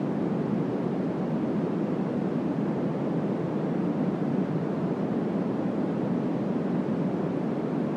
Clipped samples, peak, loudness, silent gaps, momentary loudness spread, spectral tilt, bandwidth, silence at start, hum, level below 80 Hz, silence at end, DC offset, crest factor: under 0.1%; -16 dBFS; -28 LUFS; none; 1 LU; -9.5 dB/octave; 8.2 kHz; 0 s; none; -66 dBFS; 0 s; under 0.1%; 12 dB